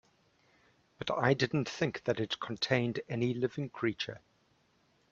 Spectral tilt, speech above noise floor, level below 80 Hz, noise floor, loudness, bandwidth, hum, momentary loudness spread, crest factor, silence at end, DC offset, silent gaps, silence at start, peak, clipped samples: -5.5 dB/octave; 38 dB; -70 dBFS; -71 dBFS; -33 LUFS; 7.6 kHz; none; 9 LU; 22 dB; 0.95 s; under 0.1%; none; 1 s; -12 dBFS; under 0.1%